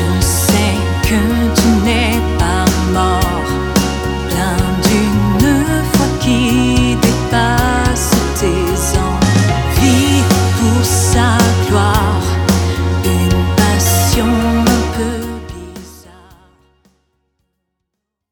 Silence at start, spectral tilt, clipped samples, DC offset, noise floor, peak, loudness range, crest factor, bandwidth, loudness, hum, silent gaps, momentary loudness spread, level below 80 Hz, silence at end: 0 s; -5 dB/octave; under 0.1%; under 0.1%; -76 dBFS; 0 dBFS; 4 LU; 14 dB; 20 kHz; -13 LUFS; none; none; 4 LU; -22 dBFS; 2.3 s